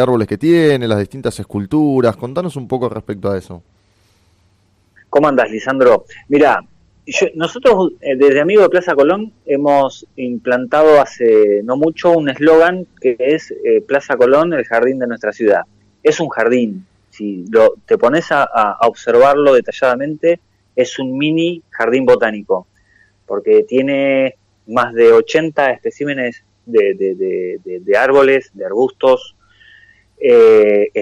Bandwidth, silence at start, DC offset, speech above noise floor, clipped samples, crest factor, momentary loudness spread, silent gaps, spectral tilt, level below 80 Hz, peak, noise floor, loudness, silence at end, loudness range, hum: 11 kHz; 0 s; under 0.1%; 43 dB; under 0.1%; 12 dB; 11 LU; none; -6 dB/octave; -54 dBFS; -2 dBFS; -56 dBFS; -14 LUFS; 0 s; 5 LU; none